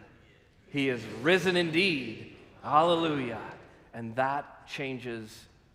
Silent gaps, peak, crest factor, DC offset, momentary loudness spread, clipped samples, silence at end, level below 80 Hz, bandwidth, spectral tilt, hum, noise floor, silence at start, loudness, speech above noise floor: none; -8 dBFS; 22 dB; under 0.1%; 19 LU; under 0.1%; 0.3 s; -66 dBFS; 15.5 kHz; -5 dB/octave; none; -59 dBFS; 0 s; -29 LUFS; 30 dB